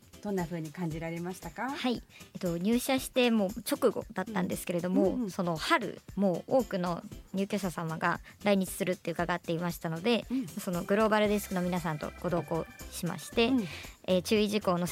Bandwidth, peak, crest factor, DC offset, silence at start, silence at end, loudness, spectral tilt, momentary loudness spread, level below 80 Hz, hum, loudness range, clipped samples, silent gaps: 16.5 kHz; -12 dBFS; 18 dB; under 0.1%; 0.15 s; 0 s; -31 LUFS; -5.5 dB/octave; 9 LU; -56 dBFS; none; 2 LU; under 0.1%; none